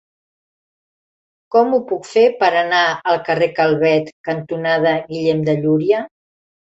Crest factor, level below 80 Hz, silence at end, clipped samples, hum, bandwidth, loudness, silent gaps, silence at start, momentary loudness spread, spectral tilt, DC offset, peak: 16 dB; -62 dBFS; 0.7 s; under 0.1%; none; 8 kHz; -17 LUFS; 4.12-4.24 s; 1.5 s; 6 LU; -6 dB/octave; under 0.1%; -2 dBFS